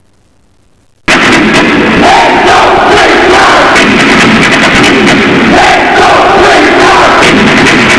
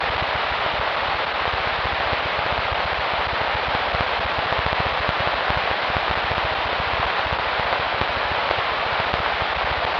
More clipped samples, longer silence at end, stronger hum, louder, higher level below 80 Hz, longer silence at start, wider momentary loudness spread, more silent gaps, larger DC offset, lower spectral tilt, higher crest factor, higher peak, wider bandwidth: neither; about the same, 0 s vs 0 s; neither; first, -3 LUFS vs -22 LUFS; first, -28 dBFS vs -38 dBFS; first, 1.1 s vs 0 s; about the same, 2 LU vs 1 LU; neither; first, 1% vs under 0.1%; about the same, -4 dB/octave vs -5 dB/octave; second, 4 dB vs 22 dB; about the same, 0 dBFS vs -2 dBFS; first, 11 kHz vs 7.2 kHz